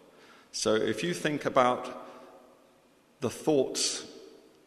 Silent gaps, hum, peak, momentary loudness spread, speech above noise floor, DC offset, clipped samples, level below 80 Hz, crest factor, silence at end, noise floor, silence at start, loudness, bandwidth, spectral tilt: none; none; -8 dBFS; 19 LU; 34 dB; under 0.1%; under 0.1%; -68 dBFS; 24 dB; 0.35 s; -63 dBFS; 0.55 s; -29 LUFS; 13.5 kHz; -3.5 dB/octave